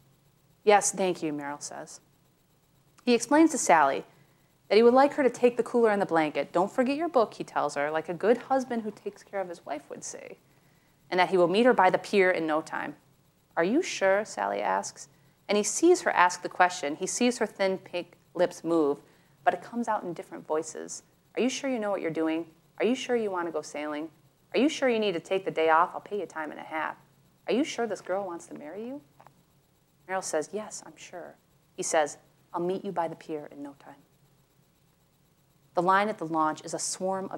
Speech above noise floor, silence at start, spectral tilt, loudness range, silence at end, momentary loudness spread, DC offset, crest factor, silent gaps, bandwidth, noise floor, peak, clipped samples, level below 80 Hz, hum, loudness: 39 dB; 0.65 s; -3.5 dB/octave; 9 LU; 0 s; 17 LU; under 0.1%; 22 dB; none; 16.5 kHz; -66 dBFS; -6 dBFS; under 0.1%; -78 dBFS; none; -27 LUFS